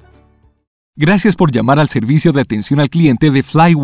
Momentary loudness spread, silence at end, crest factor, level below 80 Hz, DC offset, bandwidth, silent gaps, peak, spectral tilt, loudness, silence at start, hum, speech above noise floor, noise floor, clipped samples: 4 LU; 0 s; 12 dB; -42 dBFS; under 0.1%; 4 kHz; none; 0 dBFS; -11.5 dB/octave; -12 LUFS; 0.95 s; none; 39 dB; -50 dBFS; under 0.1%